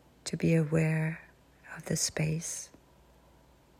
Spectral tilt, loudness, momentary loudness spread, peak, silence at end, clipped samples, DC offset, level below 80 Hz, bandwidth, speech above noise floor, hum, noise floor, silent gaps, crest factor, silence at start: -5 dB/octave; -31 LUFS; 18 LU; -16 dBFS; 1.15 s; under 0.1%; under 0.1%; -60 dBFS; 15 kHz; 31 dB; none; -61 dBFS; none; 18 dB; 0.25 s